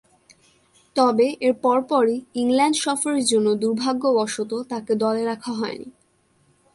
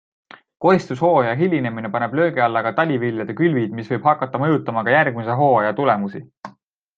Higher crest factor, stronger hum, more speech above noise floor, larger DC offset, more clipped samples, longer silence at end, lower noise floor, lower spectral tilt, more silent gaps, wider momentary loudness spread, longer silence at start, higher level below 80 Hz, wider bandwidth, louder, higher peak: about the same, 16 dB vs 18 dB; neither; first, 42 dB vs 32 dB; neither; neither; first, 0.85 s vs 0.45 s; first, -63 dBFS vs -50 dBFS; second, -3.5 dB/octave vs -8 dB/octave; second, none vs 6.37-6.41 s; about the same, 9 LU vs 7 LU; first, 0.95 s vs 0.6 s; about the same, -68 dBFS vs -64 dBFS; first, 11.5 kHz vs 7.6 kHz; about the same, -21 LUFS vs -19 LUFS; second, -6 dBFS vs -2 dBFS